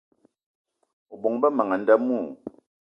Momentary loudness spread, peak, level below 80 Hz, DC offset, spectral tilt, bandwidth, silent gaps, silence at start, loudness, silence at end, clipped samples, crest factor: 18 LU; -6 dBFS; -74 dBFS; under 0.1%; -8.5 dB/octave; 5.4 kHz; none; 1.1 s; -23 LUFS; 0.4 s; under 0.1%; 20 dB